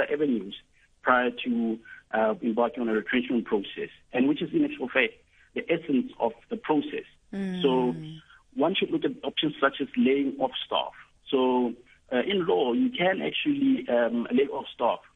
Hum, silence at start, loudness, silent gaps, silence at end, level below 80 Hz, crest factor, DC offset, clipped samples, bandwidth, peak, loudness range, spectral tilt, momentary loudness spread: none; 0 s; -27 LUFS; none; 0.15 s; -64 dBFS; 22 dB; under 0.1%; under 0.1%; 4 kHz; -6 dBFS; 3 LU; -7.5 dB/octave; 12 LU